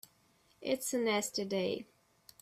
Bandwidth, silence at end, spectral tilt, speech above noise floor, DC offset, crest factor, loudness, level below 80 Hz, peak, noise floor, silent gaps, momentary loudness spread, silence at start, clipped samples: 16 kHz; 0.6 s; -3 dB/octave; 35 dB; under 0.1%; 18 dB; -35 LUFS; -76 dBFS; -20 dBFS; -70 dBFS; none; 11 LU; 0.6 s; under 0.1%